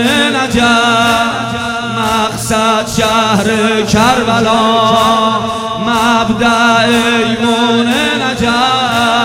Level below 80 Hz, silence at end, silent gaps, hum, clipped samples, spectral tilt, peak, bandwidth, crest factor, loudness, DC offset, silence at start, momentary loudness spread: -36 dBFS; 0 s; none; none; under 0.1%; -4 dB/octave; 0 dBFS; 16.5 kHz; 12 dB; -11 LUFS; under 0.1%; 0 s; 5 LU